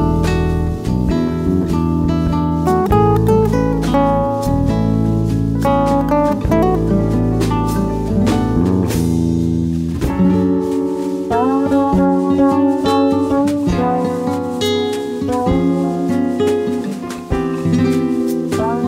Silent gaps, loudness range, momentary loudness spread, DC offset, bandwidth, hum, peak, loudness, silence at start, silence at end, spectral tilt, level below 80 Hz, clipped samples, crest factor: none; 2 LU; 5 LU; under 0.1%; 16 kHz; none; 0 dBFS; -16 LUFS; 0 s; 0 s; -7.5 dB/octave; -28 dBFS; under 0.1%; 14 dB